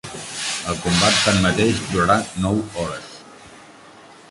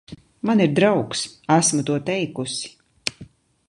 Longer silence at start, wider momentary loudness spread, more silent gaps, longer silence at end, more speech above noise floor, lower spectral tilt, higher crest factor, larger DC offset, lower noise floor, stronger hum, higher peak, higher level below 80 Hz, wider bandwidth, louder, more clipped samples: about the same, 0.05 s vs 0.1 s; first, 15 LU vs 12 LU; neither; second, 0.15 s vs 0.45 s; about the same, 26 dB vs 26 dB; about the same, -4 dB/octave vs -4.5 dB/octave; about the same, 18 dB vs 20 dB; neither; about the same, -45 dBFS vs -46 dBFS; neither; about the same, -4 dBFS vs -2 dBFS; first, -42 dBFS vs -60 dBFS; about the same, 11.5 kHz vs 11.5 kHz; about the same, -19 LUFS vs -21 LUFS; neither